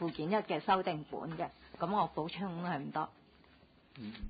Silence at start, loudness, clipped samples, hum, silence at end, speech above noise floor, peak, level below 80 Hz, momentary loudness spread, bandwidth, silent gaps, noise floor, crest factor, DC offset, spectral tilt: 0 s; -37 LUFS; under 0.1%; none; 0 s; 27 dB; -18 dBFS; -60 dBFS; 11 LU; 4.9 kHz; none; -64 dBFS; 20 dB; under 0.1%; -4.5 dB/octave